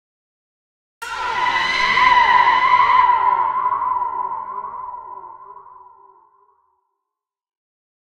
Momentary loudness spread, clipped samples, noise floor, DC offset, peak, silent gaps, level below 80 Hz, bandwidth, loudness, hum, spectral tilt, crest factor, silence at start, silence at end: 19 LU; under 0.1%; -83 dBFS; under 0.1%; -2 dBFS; none; -52 dBFS; 10 kHz; -16 LUFS; none; -1.5 dB/octave; 18 dB; 1 s; 2.3 s